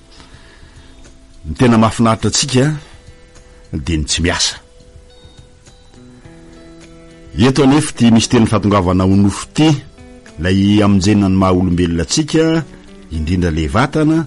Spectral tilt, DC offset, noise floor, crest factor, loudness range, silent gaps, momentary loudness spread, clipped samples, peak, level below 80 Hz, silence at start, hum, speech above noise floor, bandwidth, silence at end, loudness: -5.5 dB/octave; under 0.1%; -42 dBFS; 14 dB; 8 LU; none; 12 LU; under 0.1%; 0 dBFS; -32 dBFS; 1 s; none; 30 dB; 11.5 kHz; 0 s; -13 LUFS